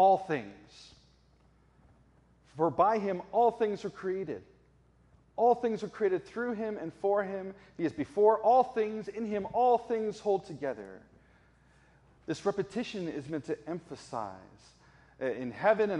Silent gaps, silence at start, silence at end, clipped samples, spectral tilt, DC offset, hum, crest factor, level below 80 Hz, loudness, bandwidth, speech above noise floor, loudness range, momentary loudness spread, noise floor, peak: none; 0 s; 0 s; under 0.1%; -6.5 dB/octave; under 0.1%; none; 20 dB; -68 dBFS; -31 LUFS; 10.5 kHz; 34 dB; 9 LU; 15 LU; -64 dBFS; -12 dBFS